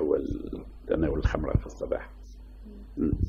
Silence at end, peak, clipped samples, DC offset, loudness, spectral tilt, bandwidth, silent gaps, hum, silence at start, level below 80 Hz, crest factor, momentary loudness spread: 0 s; -10 dBFS; under 0.1%; under 0.1%; -31 LUFS; -8.5 dB/octave; 7.4 kHz; none; none; 0 s; -36 dBFS; 18 dB; 20 LU